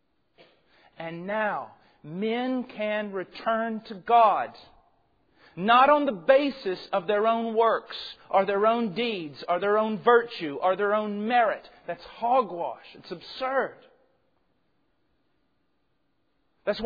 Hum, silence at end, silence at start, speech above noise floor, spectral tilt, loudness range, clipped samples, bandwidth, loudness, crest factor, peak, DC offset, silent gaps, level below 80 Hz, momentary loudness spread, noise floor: none; 0 s; 1 s; 49 dB; -7 dB/octave; 11 LU; under 0.1%; 5 kHz; -25 LUFS; 20 dB; -6 dBFS; under 0.1%; none; -68 dBFS; 16 LU; -75 dBFS